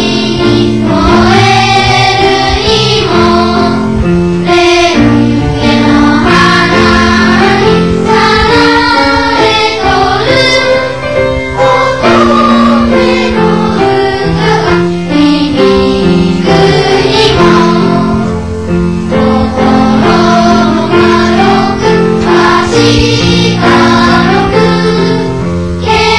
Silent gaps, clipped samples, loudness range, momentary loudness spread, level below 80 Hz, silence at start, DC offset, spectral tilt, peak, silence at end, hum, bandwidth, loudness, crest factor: none; 4%; 2 LU; 4 LU; -24 dBFS; 0 s; 3%; -5.5 dB/octave; 0 dBFS; 0 s; none; 11 kHz; -7 LUFS; 6 dB